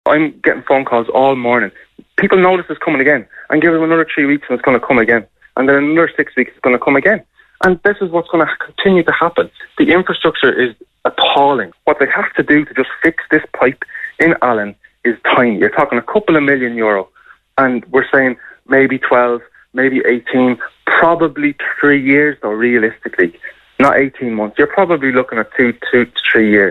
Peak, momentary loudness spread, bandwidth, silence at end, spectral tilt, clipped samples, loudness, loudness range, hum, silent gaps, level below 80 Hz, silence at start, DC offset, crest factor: 0 dBFS; 7 LU; 8.6 kHz; 0 s; -7 dB/octave; under 0.1%; -13 LUFS; 1 LU; none; none; -50 dBFS; 0.05 s; under 0.1%; 12 dB